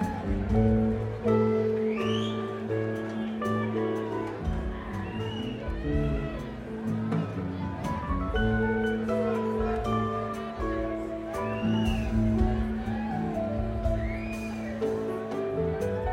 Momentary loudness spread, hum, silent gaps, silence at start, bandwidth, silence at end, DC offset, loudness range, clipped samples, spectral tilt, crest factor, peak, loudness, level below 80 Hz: 8 LU; none; none; 0 s; 12.5 kHz; 0 s; under 0.1%; 4 LU; under 0.1%; -7.5 dB/octave; 16 dB; -12 dBFS; -30 LUFS; -38 dBFS